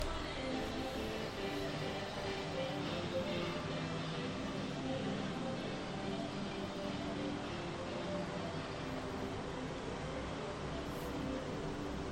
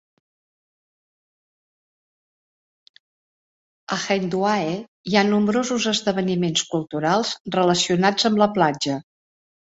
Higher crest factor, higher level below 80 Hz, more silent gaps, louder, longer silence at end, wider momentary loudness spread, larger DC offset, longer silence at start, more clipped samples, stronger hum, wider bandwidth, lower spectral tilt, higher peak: about the same, 16 dB vs 20 dB; first, -54 dBFS vs -62 dBFS; second, none vs 4.88-5.04 s, 7.40-7.45 s; second, -41 LUFS vs -21 LUFS; second, 0 s vs 0.7 s; second, 3 LU vs 8 LU; neither; second, 0 s vs 3.9 s; neither; neither; first, 16 kHz vs 8 kHz; about the same, -5.5 dB/octave vs -4.5 dB/octave; second, -24 dBFS vs -4 dBFS